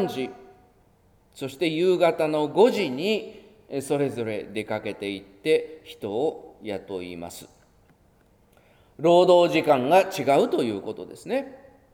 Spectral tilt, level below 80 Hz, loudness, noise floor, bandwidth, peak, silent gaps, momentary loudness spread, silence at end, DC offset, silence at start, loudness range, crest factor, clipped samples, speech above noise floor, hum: -5.5 dB/octave; -64 dBFS; -24 LUFS; -60 dBFS; 17 kHz; -6 dBFS; none; 18 LU; 0.4 s; under 0.1%; 0 s; 9 LU; 20 dB; under 0.1%; 37 dB; none